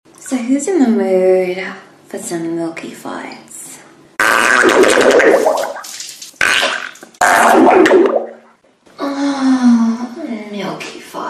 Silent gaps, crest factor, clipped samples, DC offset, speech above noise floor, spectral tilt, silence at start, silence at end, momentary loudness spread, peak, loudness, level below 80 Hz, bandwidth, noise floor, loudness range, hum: none; 14 dB; under 0.1%; under 0.1%; 35 dB; -3 dB/octave; 0.2 s; 0 s; 19 LU; 0 dBFS; -12 LUFS; -54 dBFS; 14.5 kHz; -48 dBFS; 6 LU; none